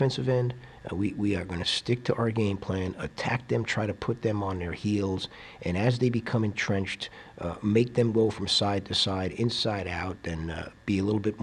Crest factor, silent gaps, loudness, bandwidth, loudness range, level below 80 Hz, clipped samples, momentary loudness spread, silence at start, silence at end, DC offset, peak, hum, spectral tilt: 18 dB; none; -28 LUFS; 11 kHz; 3 LU; -52 dBFS; under 0.1%; 10 LU; 0 s; 0 s; under 0.1%; -10 dBFS; none; -5.5 dB/octave